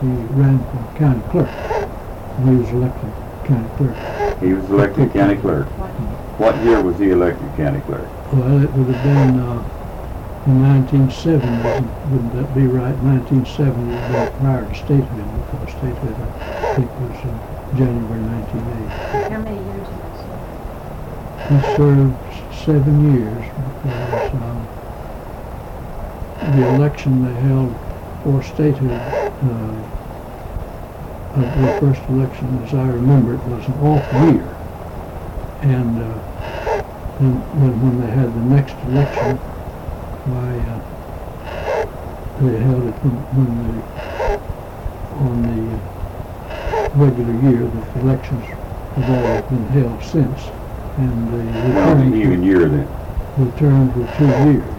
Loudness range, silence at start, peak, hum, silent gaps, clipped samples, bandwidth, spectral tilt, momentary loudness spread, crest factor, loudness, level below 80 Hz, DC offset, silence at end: 6 LU; 0 s; -6 dBFS; none; none; under 0.1%; 15.5 kHz; -9 dB/octave; 16 LU; 12 dB; -17 LUFS; -32 dBFS; under 0.1%; 0 s